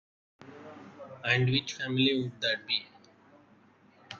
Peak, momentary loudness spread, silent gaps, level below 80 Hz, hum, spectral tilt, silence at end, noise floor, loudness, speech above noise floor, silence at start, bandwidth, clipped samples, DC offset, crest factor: -14 dBFS; 22 LU; none; -68 dBFS; none; -5 dB/octave; 0 s; -61 dBFS; -29 LUFS; 32 dB; 0.4 s; 7.2 kHz; under 0.1%; under 0.1%; 20 dB